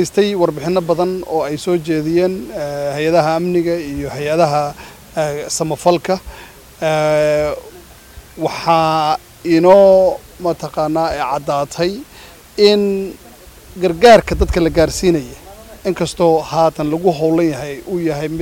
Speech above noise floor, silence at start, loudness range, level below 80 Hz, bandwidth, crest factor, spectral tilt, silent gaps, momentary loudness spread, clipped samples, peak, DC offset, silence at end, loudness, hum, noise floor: 25 dB; 0 s; 4 LU; -36 dBFS; 17 kHz; 16 dB; -5.5 dB/octave; none; 12 LU; under 0.1%; 0 dBFS; under 0.1%; 0 s; -15 LUFS; none; -39 dBFS